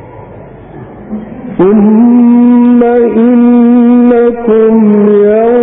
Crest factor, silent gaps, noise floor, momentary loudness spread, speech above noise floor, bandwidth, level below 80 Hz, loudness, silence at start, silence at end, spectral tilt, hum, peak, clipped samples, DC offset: 6 dB; none; -29 dBFS; 11 LU; 23 dB; 3.6 kHz; -42 dBFS; -6 LUFS; 0 s; 0 s; -13 dB/octave; none; 0 dBFS; 0.1%; under 0.1%